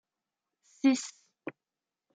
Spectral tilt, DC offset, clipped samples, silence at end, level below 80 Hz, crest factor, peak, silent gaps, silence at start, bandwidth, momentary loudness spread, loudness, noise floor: -2.5 dB/octave; under 0.1%; under 0.1%; 0.65 s; -90 dBFS; 20 dB; -14 dBFS; none; 0.85 s; 9.4 kHz; 18 LU; -29 LUFS; under -90 dBFS